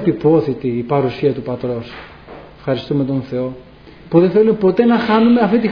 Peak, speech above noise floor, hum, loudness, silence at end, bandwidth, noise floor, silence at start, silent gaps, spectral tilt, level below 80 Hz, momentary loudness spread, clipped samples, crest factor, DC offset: 0 dBFS; 22 dB; none; -16 LUFS; 0 s; 5.4 kHz; -37 dBFS; 0 s; none; -9.5 dB/octave; -48 dBFS; 14 LU; under 0.1%; 16 dB; under 0.1%